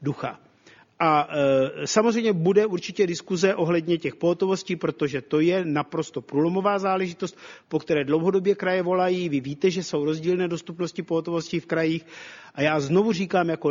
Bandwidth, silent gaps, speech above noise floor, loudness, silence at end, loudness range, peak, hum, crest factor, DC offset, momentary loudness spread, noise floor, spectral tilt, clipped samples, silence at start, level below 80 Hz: 7.6 kHz; none; 31 dB; -24 LUFS; 0 s; 3 LU; -4 dBFS; none; 20 dB; under 0.1%; 9 LU; -55 dBFS; -6 dB/octave; under 0.1%; 0 s; -66 dBFS